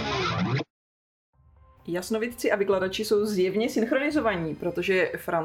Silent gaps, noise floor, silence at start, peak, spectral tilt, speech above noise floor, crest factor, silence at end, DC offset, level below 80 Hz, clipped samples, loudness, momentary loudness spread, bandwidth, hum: 0.70-1.33 s; -56 dBFS; 0 s; -10 dBFS; -5.5 dB/octave; 31 dB; 16 dB; 0 s; under 0.1%; -54 dBFS; under 0.1%; -26 LUFS; 7 LU; 16.5 kHz; none